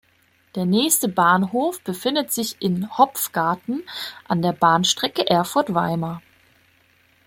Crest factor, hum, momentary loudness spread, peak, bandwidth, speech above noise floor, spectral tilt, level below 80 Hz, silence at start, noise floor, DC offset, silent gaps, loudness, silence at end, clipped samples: 20 dB; none; 11 LU; -2 dBFS; 16.5 kHz; 40 dB; -4 dB/octave; -62 dBFS; 0.55 s; -60 dBFS; under 0.1%; none; -21 LUFS; 1.1 s; under 0.1%